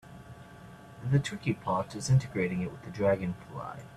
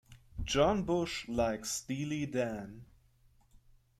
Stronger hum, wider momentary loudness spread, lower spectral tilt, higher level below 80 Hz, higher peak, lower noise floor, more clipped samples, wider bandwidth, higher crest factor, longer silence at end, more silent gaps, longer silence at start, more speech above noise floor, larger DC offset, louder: neither; first, 22 LU vs 15 LU; first, -6.5 dB/octave vs -4.5 dB/octave; second, -58 dBFS vs -52 dBFS; about the same, -14 dBFS vs -16 dBFS; second, -50 dBFS vs -66 dBFS; neither; second, 12 kHz vs 16 kHz; about the same, 18 dB vs 20 dB; second, 0 s vs 1.15 s; neither; about the same, 0.05 s vs 0.1 s; second, 19 dB vs 33 dB; neither; first, -31 LUFS vs -34 LUFS